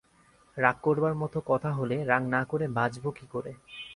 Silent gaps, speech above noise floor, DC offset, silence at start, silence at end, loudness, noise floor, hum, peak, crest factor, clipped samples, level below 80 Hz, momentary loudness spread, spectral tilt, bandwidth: none; 33 dB; under 0.1%; 0.55 s; 0 s; -29 LUFS; -62 dBFS; none; -6 dBFS; 24 dB; under 0.1%; -62 dBFS; 12 LU; -7.5 dB/octave; 11.5 kHz